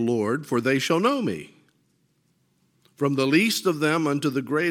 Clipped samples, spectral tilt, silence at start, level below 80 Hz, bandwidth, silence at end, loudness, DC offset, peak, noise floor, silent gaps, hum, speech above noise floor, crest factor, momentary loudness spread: under 0.1%; -5 dB/octave; 0 s; -72 dBFS; 17 kHz; 0 s; -23 LUFS; under 0.1%; -8 dBFS; -67 dBFS; none; none; 45 dB; 16 dB; 7 LU